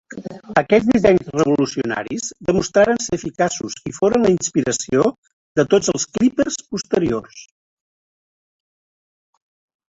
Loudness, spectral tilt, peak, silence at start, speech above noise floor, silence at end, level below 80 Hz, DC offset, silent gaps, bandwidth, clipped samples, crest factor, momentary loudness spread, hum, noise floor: -18 LUFS; -4.5 dB/octave; -2 dBFS; 0.1 s; over 72 dB; 2.45 s; -50 dBFS; under 0.1%; 5.18-5.23 s, 5.33-5.55 s; 8.2 kHz; under 0.1%; 18 dB; 9 LU; none; under -90 dBFS